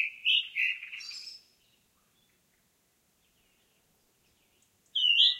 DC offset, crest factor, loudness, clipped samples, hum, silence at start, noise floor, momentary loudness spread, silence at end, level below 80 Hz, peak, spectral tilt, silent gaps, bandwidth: under 0.1%; 22 dB; -27 LUFS; under 0.1%; none; 0 s; -72 dBFS; 20 LU; 0 s; -84 dBFS; -12 dBFS; 3.5 dB/octave; none; 16 kHz